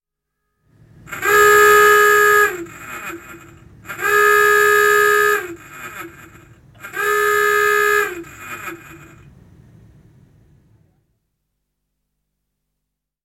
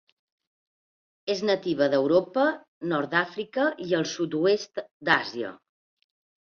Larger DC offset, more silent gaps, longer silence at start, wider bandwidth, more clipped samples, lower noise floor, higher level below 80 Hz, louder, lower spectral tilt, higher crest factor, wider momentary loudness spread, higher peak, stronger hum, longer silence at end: neither; second, none vs 2.68-2.81 s, 4.91-5.00 s; second, 1.1 s vs 1.25 s; first, 16.5 kHz vs 7.2 kHz; neither; second, -79 dBFS vs under -90 dBFS; first, -54 dBFS vs -70 dBFS; first, -13 LUFS vs -26 LUFS; second, -1.5 dB/octave vs -5 dB/octave; about the same, 16 dB vs 20 dB; first, 23 LU vs 11 LU; first, -2 dBFS vs -6 dBFS; first, 50 Hz at -65 dBFS vs none; first, 4.5 s vs 0.9 s